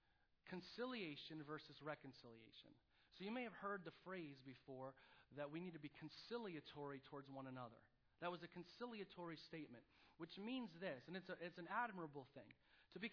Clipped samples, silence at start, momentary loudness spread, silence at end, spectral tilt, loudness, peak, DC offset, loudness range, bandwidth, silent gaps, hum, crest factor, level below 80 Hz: under 0.1%; 0.45 s; 13 LU; 0 s; -3.5 dB/octave; -54 LUFS; -32 dBFS; under 0.1%; 3 LU; 5.4 kHz; none; none; 22 dB; -86 dBFS